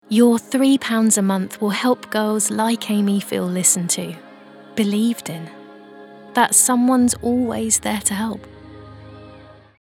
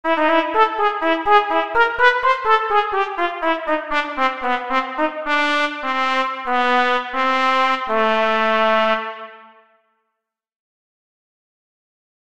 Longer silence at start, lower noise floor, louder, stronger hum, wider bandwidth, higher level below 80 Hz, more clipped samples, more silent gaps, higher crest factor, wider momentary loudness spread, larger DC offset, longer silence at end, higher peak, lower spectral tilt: about the same, 0.1 s vs 0.05 s; second, -43 dBFS vs -78 dBFS; about the same, -18 LUFS vs -18 LUFS; neither; first, 17.5 kHz vs 10.5 kHz; about the same, -54 dBFS vs -52 dBFS; neither; neither; about the same, 18 dB vs 20 dB; first, 13 LU vs 6 LU; second, under 0.1% vs 1%; second, 0.45 s vs 1.7 s; about the same, 0 dBFS vs 0 dBFS; about the same, -3.5 dB/octave vs -3.5 dB/octave